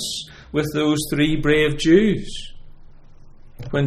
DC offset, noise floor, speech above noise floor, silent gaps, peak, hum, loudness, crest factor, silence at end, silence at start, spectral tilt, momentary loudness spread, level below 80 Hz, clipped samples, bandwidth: under 0.1%; -42 dBFS; 23 dB; none; -2 dBFS; none; -19 LUFS; 18 dB; 0 s; 0 s; -5.5 dB/octave; 18 LU; -36 dBFS; under 0.1%; 15.5 kHz